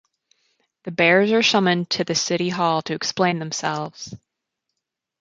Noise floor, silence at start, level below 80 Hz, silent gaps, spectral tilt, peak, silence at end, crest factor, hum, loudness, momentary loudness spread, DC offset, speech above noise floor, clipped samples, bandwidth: -82 dBFS; 0.85 s; -66 dBFS; none; -4 dB/octave; -4 dBFS; 1.05 s; 20 dB; none; -20 LUFS; 16 LU; under 0.1%; 61 dB; under 0.1%; 9 kHz